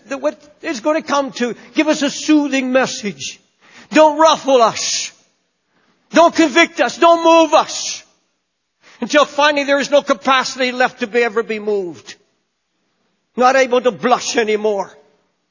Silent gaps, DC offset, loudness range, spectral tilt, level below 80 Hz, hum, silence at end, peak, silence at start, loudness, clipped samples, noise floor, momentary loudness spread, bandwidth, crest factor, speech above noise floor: none; under 0.1%; 4 LU; -2.5 dB/octave; -66 dBFS; none; 0.65 s; 0 dBFS; 0.1 s; -15 LUFS; under 0.1%; -70 dBFS; 12 LU; 7.4 kHz; 16 dB; 56 dB